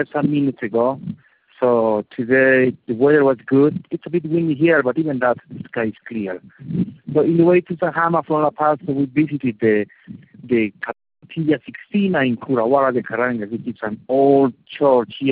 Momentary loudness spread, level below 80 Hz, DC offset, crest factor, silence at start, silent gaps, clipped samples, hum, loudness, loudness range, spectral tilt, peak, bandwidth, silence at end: 13 LU; -60 dBFS; under 0.1%; 16 dB; 0 s; none; under 0.1%; none; -18 LUFS; 4 LU; -6 dB/octave; -2 dBFS; 4.6 kHz; 0 s